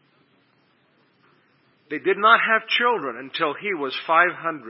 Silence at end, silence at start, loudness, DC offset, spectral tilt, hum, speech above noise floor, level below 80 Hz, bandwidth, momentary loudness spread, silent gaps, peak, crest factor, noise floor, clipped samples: 0 s; 1.9 s; -20 LUFS; under 0.1%; -7 dB/octave; none; 41 dB; -88 dBFS; 5.8 kHz; 11 LU; none; 0 dBFS; 22 dB; -63 dBFS; under 0.1%